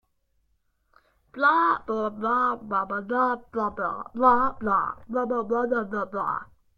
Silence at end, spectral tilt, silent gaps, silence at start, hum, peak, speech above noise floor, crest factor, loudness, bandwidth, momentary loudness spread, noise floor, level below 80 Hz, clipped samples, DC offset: 0.35 s; -7.5 dB/octave; none; 1.35 s; none; -8 dBFS; 45 dB; 18 dB; -25 LUFS; 6.8 kHz; 10 LU; -70 dBFS; -58 dBFS; under 0.1%; under 0.1%